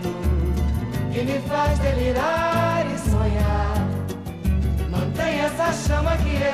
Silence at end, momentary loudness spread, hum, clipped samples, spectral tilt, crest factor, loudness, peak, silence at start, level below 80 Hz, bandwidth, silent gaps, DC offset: 0 s; 4 LU; none; under 0.1%; -6.5 dB/octave; 12 dB; -23 LUFS; -8 dBFS; 0 s; -26 dBFS; 15 kHz; none; 0.2%